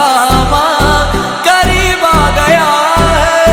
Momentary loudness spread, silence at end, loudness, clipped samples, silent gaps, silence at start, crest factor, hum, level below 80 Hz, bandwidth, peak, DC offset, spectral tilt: 2 LU; 0 s; -9 LUFS; 0.2%; none; 0 s; 8 dB; none; -20 dBFS; 19.5 kHz; 0 dBFS; under 0.1%; -4 dB/octave